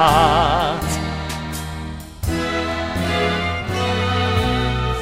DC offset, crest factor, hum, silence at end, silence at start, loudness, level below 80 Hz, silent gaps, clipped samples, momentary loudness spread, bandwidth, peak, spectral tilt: 0.4%; 18 dB; none; 0 s; 0 s; -20 LUFS; -30 dBFS; none; under 0.1%; 12 LU; 16 kHz; -2 dBFS; -5 dB/octave